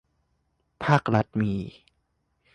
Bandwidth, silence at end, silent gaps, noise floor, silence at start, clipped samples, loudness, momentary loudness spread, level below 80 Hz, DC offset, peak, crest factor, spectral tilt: 9.2 kHz; 0.85 s; none; -73 dBFS; 0.8 s; under 0.1%; -25 LUFS; 11 LU; -54 dBFS; under 0.1%; -6 dBFS; 22 dB; -7.5 dB/octave